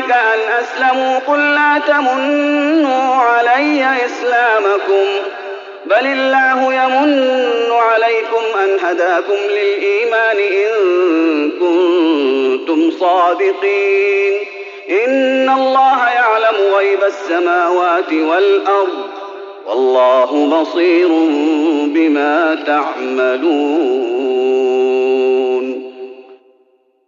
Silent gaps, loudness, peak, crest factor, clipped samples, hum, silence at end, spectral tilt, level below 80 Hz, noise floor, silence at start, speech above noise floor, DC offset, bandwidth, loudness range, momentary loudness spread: none; -13 LUFS; -2 dBFS; 12 dB; under 0.1%; none; 0.75 s; 1 dB/octave; -76 dBFS; -55 dBFS; 0 s; 43 dB; under 0.1%; 7.4 kHz; 2 LU; 5 LU